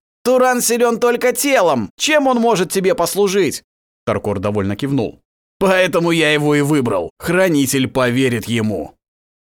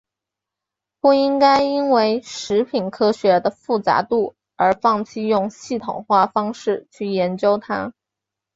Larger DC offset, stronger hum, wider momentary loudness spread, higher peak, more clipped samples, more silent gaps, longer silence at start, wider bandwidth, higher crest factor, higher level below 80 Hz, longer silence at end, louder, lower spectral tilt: neither; neither; second, 7 LU vs 10 LU; about the same, -2 dBFS vs -2 dBFS; neither; first, 1.90-1.98 s, 3.64-4.07 s, 5.25-5.60 s, 7.10-7.17 s vs none; second, 0.25 s vs 1.05 s; first, 20 kHz vs 8 kHz; about the same, 16 dB vs 16 dB; first, -50 dBFS vs -60 dBFS; about the same, 0.65 s vs 0.65 s; first, -16 LUFS vs -19 LUFS; about the same, -4.5 dB/octave vs -5.5 dB/octave